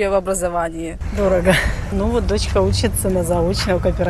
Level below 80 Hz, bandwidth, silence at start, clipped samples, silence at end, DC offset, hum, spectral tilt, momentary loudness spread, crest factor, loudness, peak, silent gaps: -26 dBFS; 13 kHz; 0 s; under 0.1%; 0 s; under 0.1%; none; -5 dB/octave; 6 LU; 18 dB; -19 LUFS; 0 dBFS; none